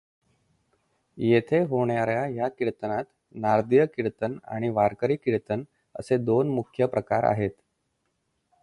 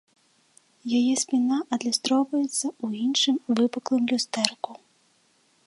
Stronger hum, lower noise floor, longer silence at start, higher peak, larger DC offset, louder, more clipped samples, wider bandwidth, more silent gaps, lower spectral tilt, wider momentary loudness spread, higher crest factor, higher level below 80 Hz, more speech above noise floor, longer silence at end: neither; first, -75 dBFS vs -65 dBFS; first, 1.15 s vs 0.85 s; second, -8 dBFS vs -2 dBFS; neither; about the same, -26 LUFS vs -25 LUFS; neither; about the same, 11.5 kHz vs 11.5 kHz; neither; first, -8.5 dB/octave vs -2.5 dB/octave; first, 10 LU vs 6 LU; second, 18 dB vs 24 dB; first, -60 dBFS vs -78 dBFS; first, 51 dB vs 40 dB; first, 1.1 s vs 0.9 s